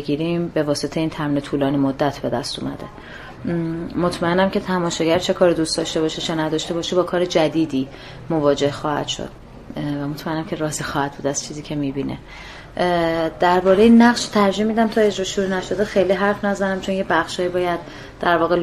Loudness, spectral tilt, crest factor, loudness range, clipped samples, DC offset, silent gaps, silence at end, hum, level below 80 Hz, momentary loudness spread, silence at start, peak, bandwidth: -20 LUFS; -5 dB/octave; 18 dB; 7 LU; under 0.1%; under 0.1%; none; 0 s; none; -46 dBFS; 11 LU; 0 s; -2 dBFS; 14 kHz